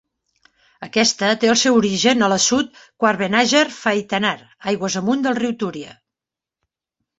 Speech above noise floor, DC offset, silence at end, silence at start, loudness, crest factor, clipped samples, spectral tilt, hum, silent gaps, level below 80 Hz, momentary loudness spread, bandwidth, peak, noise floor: 70 dB; under 0.1%; 1.25 s; 0.8 s; -18 LUFS; 18 dB; under 0.1%; -3 dB/octave; none; none; -60 dBFS; 12 LU; 8.2 kHz; -2 dBFS; -88 dBFS